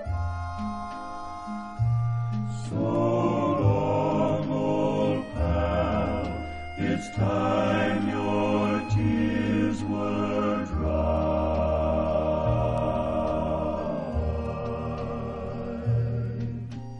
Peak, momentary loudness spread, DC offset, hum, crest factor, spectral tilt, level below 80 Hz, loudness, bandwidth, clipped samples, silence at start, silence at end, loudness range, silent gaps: -10 dBFS; 9 LU; under 0.1%; none; 16 dB; -8 dB/octave; -38 dBFS; -27 LUFS; 10 kHz; under 0.1%; 0 s; 0 s; 4 LU; none